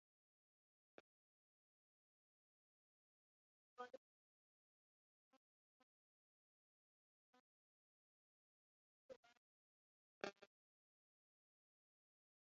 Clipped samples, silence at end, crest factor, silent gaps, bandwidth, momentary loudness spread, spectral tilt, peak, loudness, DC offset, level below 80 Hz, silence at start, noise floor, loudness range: under 0.1%; 2 s; 38 dB; 3.97-5.31 s, 5.37-7.33 s, 7.40-9.09 s, 9.16-9.23 s, 9.37-10.21 s; 6.4 kHz; 12 LU; -1.5 dB/octave; -30 dBFS; -59 LUFS; under 0.1%; under -90 dBFS; 3.8 s; under -90 dBFS; 4 LU